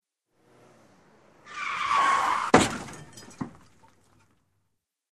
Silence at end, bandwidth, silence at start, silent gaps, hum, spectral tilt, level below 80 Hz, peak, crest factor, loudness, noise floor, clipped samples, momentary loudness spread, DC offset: 1.65 s; 13.5 kHz; 1.45 s; none; none; -3.5 dB/octave; -58 dBFS; -2 dBFS; 28 dB; -24 LUFS; -78 dBFS; under 0.1%; 21 LU; under 0.1%